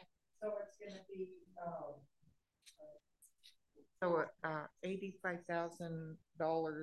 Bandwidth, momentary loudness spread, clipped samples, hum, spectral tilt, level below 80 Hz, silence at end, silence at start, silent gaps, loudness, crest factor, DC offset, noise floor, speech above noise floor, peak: 12 kHz; 22 LU; under 0.1%; none; -6.5 dB/octave; -84 dBFS; 0 s; 0 s; none; -44 LUFS; 22 dB; under 0.1%; -76 dBFS; 33 dB; -24 dBFS